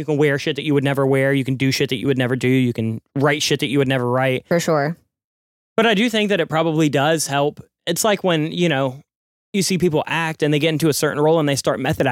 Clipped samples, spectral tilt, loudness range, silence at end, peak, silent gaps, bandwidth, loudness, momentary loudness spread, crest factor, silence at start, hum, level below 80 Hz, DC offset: under 0.1%; -5 dB/octave; 1 LU; 0 s; -4 dBFS; 5.24-5.76 s, 9.16-9.53 s; 17 kHz; -19 LUFS; 5 LU; 14 dB; 0 s; none; -56 dBFS; under 0.1%